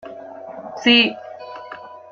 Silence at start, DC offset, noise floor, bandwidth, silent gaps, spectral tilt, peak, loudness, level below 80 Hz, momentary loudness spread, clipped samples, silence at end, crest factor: 0.05 s; under 0.1%; -37 dBFS; 7 kHz; none; -3.5 dB/octave; -2 dBFS; -15 LUFS; -66 dBFS; 23 LU; under 0.1%; 0.25 s; 20 dB